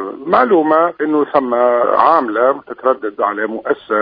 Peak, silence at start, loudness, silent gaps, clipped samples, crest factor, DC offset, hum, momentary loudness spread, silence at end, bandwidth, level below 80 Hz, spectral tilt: 0 dBFS; 0 s; -14 LUFS; none; under 0.1%; 14 dB; under 0.1%; none; 7 LU; 0 s; 5.2 kHz; -60 dBFS; -8.5 dB/octave